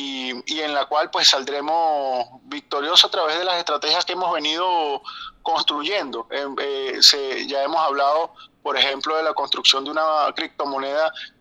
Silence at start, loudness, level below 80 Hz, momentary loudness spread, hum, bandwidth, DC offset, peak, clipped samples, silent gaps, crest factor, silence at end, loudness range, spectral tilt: 0 s; -20 LUFS; -66 dBFS; 13 LU; none; 19.5 kHz; under 0.1%; 0 dBFS; under 0.1%; none; 22 dB; 0.1 s; 3 LU; 0 dB/octave